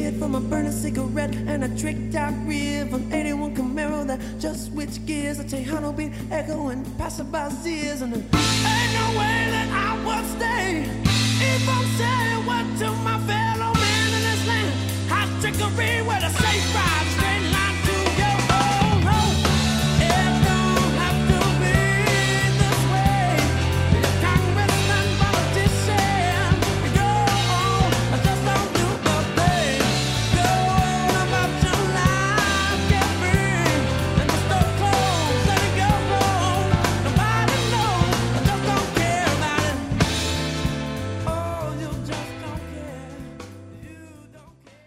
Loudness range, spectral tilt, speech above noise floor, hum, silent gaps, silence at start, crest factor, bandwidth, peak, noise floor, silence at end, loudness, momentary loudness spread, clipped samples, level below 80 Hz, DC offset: 8 LU; -4.5 dB/octave; 25 dB; none; none; 0 s; 16 dB; 16 kHz; -4 dBFS; -49 dBFS; 0.45 s; -21 LUFS; 9 LU; under 0.1%; -34 dBFS; under 0.1%